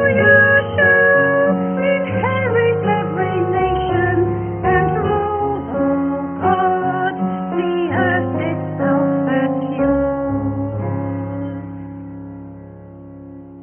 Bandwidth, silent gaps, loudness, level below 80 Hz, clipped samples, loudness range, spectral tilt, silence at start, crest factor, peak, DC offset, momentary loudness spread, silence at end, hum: 3.4 kHz; none; -17 LUFS; -40 dBFS; under 0.1%; 7 LU; -12 dB/octave; 0 s; 18 dB; 0 dBFS; under 0.1%; 19 LU; 0 s; none